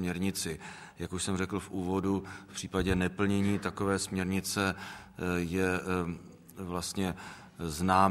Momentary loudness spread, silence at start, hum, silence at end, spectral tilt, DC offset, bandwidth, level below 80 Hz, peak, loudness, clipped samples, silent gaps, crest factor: 13 LU; 0 s; none; 0 s; -5 dB/octave; under 0.1%; 15.5 kHz; -52 dBFS; -10 dBFS; -33 LUFS; under 0.1%; none; 22 dB